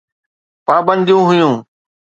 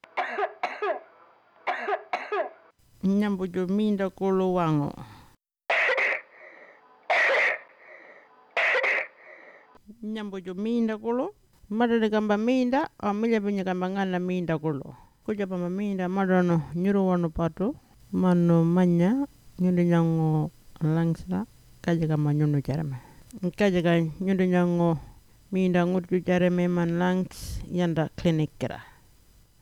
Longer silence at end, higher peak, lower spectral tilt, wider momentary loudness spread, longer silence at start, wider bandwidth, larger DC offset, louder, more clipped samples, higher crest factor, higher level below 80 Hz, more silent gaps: second, 0.6 s vs 0.8 s; first, 0 dBFS vs -10 dBFS; about the same, -7 dB/octave vs -7.5 dB/octave; about the same, 11 LU vs 12 LU; first, 0.7 s vs 0.15 s; second, 7.8 kHz vs 12 kHz; neither; first, -13 LUFS vs -26 LUFS; neither; about the same, 14 dB vs 18 dB; second, -62 dBFS vs -52 dBFS; neither